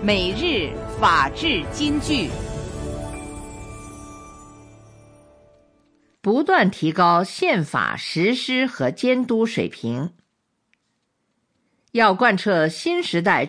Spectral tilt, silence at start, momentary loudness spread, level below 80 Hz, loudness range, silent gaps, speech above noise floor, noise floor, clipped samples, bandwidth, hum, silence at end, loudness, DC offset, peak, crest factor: -5 dB/octave; 0 s; 17 LU; -42 dBFS; 14 LU; none; 52 dB; -72 dBFS; under 0.1%; 10.5 kHz; none; 0 s; -20 LUFS; under 0.1%; -4 dBFS; 18 dB